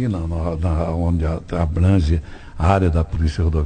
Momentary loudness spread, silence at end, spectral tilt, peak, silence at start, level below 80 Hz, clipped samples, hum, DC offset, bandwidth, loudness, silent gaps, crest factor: 7 LU; 0 s; -8.5 dB/octave; -4 dBFS; 0 s; -28 dBFS; under 0.1%; none; under 0.1%; 9 kHz; -20 LUFS; none; 16 dB